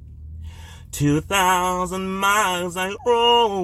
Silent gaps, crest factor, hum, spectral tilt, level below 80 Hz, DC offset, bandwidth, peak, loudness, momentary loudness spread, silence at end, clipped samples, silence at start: none; 16 dB; none; -3.5 dB/octave; -44 dBFS; under 0.1%; 15.5 kHz; -6 dBFS; -19 LUFS; 22 LU; 0 s; under 0.1%; 0 s